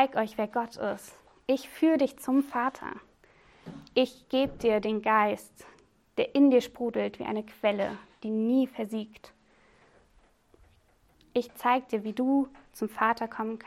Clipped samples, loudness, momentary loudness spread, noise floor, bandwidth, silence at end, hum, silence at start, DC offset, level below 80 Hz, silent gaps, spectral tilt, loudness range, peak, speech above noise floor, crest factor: under 0.1%; -29 LUFS; 13 LU; -64 dBFS; 15 kHz; 0.1 s; none; 0 s; under 0.1%; -64 dBFS; none; -5.5 dB/octave; 7 LU; -10 dBFS; 36 dB; 20 dB